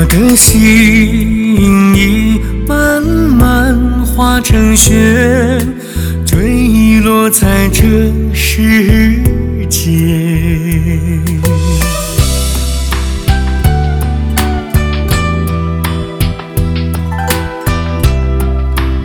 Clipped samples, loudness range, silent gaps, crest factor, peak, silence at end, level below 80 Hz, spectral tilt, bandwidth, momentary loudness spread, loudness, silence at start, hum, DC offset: 0.5%; 5 LU; none; 10 dB; 0 dBFS; 0 s; -16 dBFS; -5 dB/octave; over 20 kHz; 9 LU; -10 LUFS; 0 s; none; under 0.1%